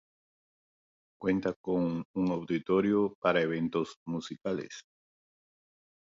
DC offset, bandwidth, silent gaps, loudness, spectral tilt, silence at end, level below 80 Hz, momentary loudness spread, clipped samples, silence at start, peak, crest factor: under 0.1%; 7.8 kHz; 1.56-1.64 s, 2.05-2.14 s, 3.15-3.22 s, 3.97-4.06 s; -31 LUFS; -7 dB/octave; 1.25 s; -66 dBFS; 10 LU; under 0.1%; 1.2 s; -14 dBFS; 20 dB